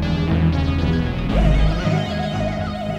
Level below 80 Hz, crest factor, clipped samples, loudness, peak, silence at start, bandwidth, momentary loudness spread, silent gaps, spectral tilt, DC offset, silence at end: -24 dBFS; 14 dB; under 0.1%; -20 LUFS; -6 dBFS; 0 s; 8.6 kHz; 5 LU; none; -7.5 dB/octave; under 0.1%; 0 s